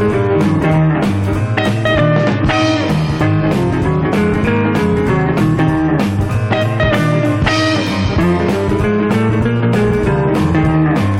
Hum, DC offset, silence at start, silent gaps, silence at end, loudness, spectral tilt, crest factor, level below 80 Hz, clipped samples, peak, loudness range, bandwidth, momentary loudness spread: none; under 0.1%; 0 s; none; 0 s; -14 LUFS; -7 dB/octave; 12 dB; -30 dBFS; under 0.1%; -2 dBFS; 0 LU; 13 kHz; 2 LU